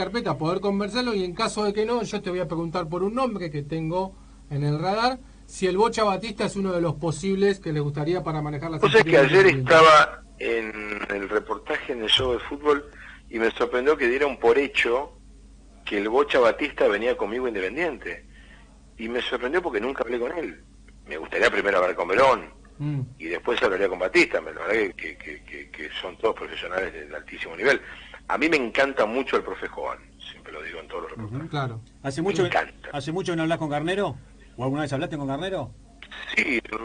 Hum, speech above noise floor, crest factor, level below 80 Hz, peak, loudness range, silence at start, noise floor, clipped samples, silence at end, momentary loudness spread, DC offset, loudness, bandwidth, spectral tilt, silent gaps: none; 25 dB; 18 dB; -50 dBFS; -6 dBFS; 10 LU; 0 s; -49 dBFS; under 0.1%; 0 s; 15 LU; under 0.1%; -24 LUFS; 10 kHz; -5 dB/octave; none